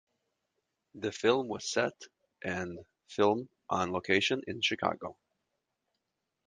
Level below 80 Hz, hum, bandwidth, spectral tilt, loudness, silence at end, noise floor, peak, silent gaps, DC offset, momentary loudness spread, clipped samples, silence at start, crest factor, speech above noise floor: -64 dBFS; none; 9.8 kHz; -4 dB/octave; -32 LUFS; 1.35 s; -85 dBFS; -10 dBFS; none; under 0.1%; 14 LU; under 0.1%; 0.95 s; 24 dB; 53 dB